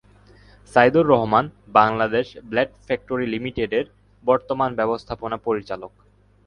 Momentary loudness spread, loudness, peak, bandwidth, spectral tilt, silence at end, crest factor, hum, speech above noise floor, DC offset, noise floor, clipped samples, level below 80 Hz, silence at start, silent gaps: 12 LU; -21 LUFS; 0 dBFS; 10.5 kHz; -7 dB/octave; 0.6 s; 22 dB; 50 Hz at -50 dBFS; 30 dB; under 0.1%; -50 dBFS; under 0.1%; -50 dBFS; 0.75 s; none